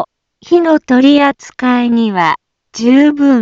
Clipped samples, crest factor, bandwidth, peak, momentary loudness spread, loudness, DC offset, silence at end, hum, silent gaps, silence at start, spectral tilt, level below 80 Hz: under 0.1%; 10 dB; 7.6 kHz; 0 dBFS; 9 LU; -11 LUFS; under 0.1%; 0 s; none; none; 0 s; -5 dB/octave; -56 dBFS